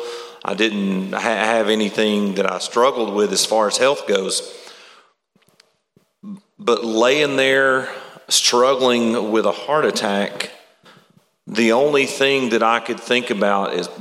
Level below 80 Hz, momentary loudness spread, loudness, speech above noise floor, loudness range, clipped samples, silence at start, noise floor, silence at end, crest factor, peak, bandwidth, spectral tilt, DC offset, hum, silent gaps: -74 dBFS; 12 LU; -18 LUFS; 44 dB; 5 LU; under 0.1%; 0 s; -61 dBFS; 0 s; 18 dB; 0 dBFS; 16 kHz; -3 dB/octave; under 0.1%; none; none